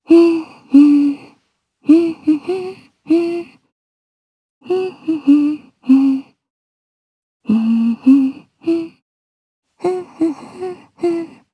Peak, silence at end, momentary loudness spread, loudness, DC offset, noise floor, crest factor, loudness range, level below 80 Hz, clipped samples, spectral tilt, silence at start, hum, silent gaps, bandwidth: 0 dBFS; 0.3 s; 16 LU; -16 LUFS; under 0.1%; -63 dBFS; 16 dB; 4 LU; -68 dBFS; under 0.1%; -7.5 dB/octave; 0.1 s; none; 3.72-4.61 s, 6.50-7.40 s, 9.02-9.63 s; 9.8 kHz